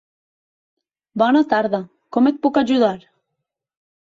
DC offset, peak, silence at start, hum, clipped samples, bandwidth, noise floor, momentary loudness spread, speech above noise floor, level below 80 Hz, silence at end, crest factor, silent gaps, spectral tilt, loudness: under 0.1%; -2 dBFS; 1.15 s; none; under 0.1%; 7.6 kHz; -79 dBFS; 10 LU; 62 dB; -64 dBFS; 1.15 s; 18 dB; none; -6.5 dB/octave; -18 LUFS